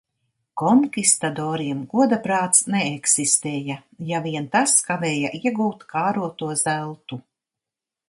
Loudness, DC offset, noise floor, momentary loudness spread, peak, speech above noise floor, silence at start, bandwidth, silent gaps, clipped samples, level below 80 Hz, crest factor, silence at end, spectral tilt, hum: -20 LUFS; under 0.1%; -87 dBFS; 13 LU; 0 dBFS; 66 dB; 0.55 s; 12 kHz; none; under 0.1%; -68 dBFS; 22 dB; 0.9 s; -3.5 dB/octave; none